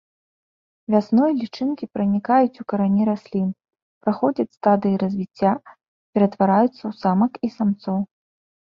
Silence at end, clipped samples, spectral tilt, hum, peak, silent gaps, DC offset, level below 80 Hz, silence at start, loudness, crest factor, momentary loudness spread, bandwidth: 0.6 s; under 0.1%; -9.5 dB/octave; none; -4 dBFS; 3.82-4.01 s, 5.88-6.13 s; under 0.1%; -64 dBFS; 0.9 s; -21 LUFS; 18 dB; 9 LU; 6 kHz